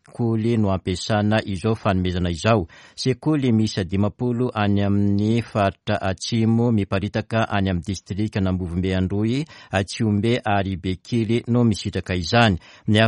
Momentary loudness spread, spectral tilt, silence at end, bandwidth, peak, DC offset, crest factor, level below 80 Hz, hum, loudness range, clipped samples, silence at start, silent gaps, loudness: 6 LU; -6.5 dB/octave; 0 s; 11 kHz; -2 dBFS; under 0.1%; 20 dB; -46 dBFS; none; 2 LU; under 0.1%; 0.15 s; none; -22 LUFS